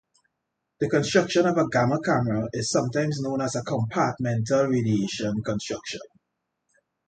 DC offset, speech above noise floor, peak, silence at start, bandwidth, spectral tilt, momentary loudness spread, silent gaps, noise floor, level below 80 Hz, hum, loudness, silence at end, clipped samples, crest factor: under 0.1%; 56 dB; -6 dBFS; 0.8 s; 9.2 kHz; -5.5 dB/octave; 8 LU; none; -80 dBFS; -58 dBFS; none; -25 LUFS; 1 s; under 0.1%; 20 dB